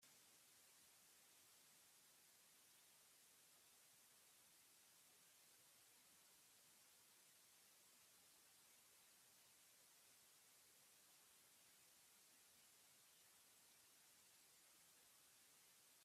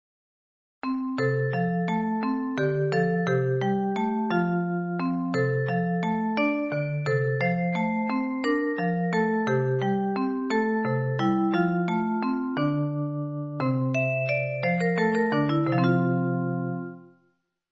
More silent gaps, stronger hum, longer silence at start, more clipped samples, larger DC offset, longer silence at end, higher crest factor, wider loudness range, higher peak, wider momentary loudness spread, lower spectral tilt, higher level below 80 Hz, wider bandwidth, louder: neither; neither; second, 0 s vs 0.85 s; neither; neither; second, 0 s vs 0.65 s; about the same, 14 dB vs 14 dB; about the same, 0 LU vs 1 LU; second, -58 dBFS vs -12 dBFS; second, 1 LU vs 4 LU; second, 0 dB/octave vs -8.5 dB/octave; second, under -90 dBFS vs -66 dBFS; first, 15.5 kHz vs 7.8 kHz; second, -70 LUFS vs -26 LUFS